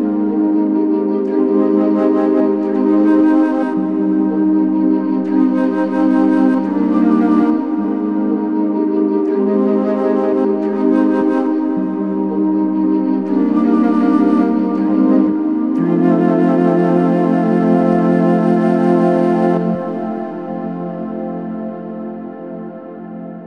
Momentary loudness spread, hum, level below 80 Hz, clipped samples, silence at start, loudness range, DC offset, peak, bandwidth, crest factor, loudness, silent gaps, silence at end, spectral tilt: 11 LU; none; -68 dBFS; under 0.1%; 0 s; 3 LU; under 0.1%; -2 dBFS; 5 kHz; 14 dB; -15 LUFS; none; 0 s; -10 dB/octave